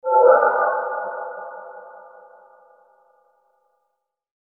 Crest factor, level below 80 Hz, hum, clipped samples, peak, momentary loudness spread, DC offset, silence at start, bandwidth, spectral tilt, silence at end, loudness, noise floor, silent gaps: 22 dB; -80 dBFS; none; under 0.1%; -2 dBFS; 26 LU; under 0.1%; 0.05 s; 2.1 kHz; -7.5 dB/octave; 2.5 s; -19 LUFS; -76 dBFS; none